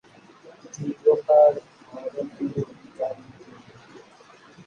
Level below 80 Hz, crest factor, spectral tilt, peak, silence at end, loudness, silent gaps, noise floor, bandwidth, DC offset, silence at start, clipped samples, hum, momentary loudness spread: -70 dBFS; 20 dB; -7 dB/octave; -6 dBFS; 0.7 s; -23 LUFS; none; -51 dBFS; 7 kHz; under 0.1%; 0.65 s; under 0.1%; none; 21 LU